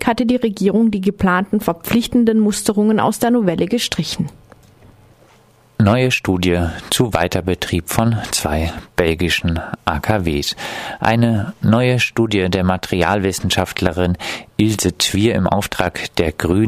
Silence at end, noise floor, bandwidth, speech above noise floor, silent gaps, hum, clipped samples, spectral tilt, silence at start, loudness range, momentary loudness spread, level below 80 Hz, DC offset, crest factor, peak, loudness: 0 s; -50 dBFS; 15.5 kHz; 34 dB; none; none; under 0.1%; -5 dB/octave; 0 s; 3 LU; 6 LU; -36 dBFS; under 0.1%; 16 dB; 0 dBFS; -17 LUFS